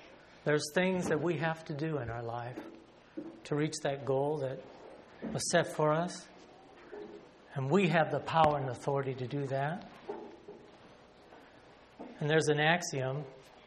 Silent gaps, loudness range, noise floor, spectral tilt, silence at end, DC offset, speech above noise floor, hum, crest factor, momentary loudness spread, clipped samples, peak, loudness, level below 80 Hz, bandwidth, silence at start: none; 5 LU; -58 dBFS; -5 dB/octave; 0.05 s; under 0.1%; 26 dB; none; 24 dB; 22 LU; under 0.1%; -10 dBFS; -33 LUFS; -66 dBFS; 12 kHz; 0 s